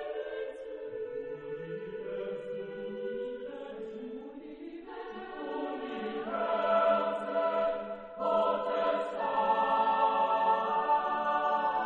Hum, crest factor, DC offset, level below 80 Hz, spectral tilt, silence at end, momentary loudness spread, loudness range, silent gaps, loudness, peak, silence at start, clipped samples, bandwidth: none; 16 dB; under 0.1%; -68 dBFS; -6 dB/octave; 0 s; 15 LU; 11 LU; none; -32 LUFS; -16 dBFS; 0 s; under 0.1%; 7.6 kHz